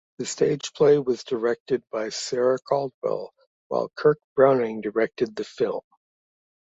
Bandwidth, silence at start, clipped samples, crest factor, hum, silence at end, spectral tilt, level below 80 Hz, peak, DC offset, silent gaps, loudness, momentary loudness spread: 8 kHz; 0.2 s; under 0.1%; 20 dB; none; 0.95 s; -5 dB/octave; -68 dBFS; -4 dBFS; under 0.1%; 1.60-1.66 s, 2.94-3.01 s, 3.47-3.70 s, 4.24-4.35 s; -24 LUFS; 10 LU